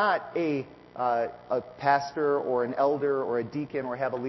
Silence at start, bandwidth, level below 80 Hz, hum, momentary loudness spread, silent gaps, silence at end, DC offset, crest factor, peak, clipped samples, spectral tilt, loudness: 0 s; 6.2 kHz; -68 dBFS; none; 7 LU; none; 0 s; under 0.1%; 18 dB; -10 dBFS; under 0.1%; -6.5 dB/octave; -28 LUFS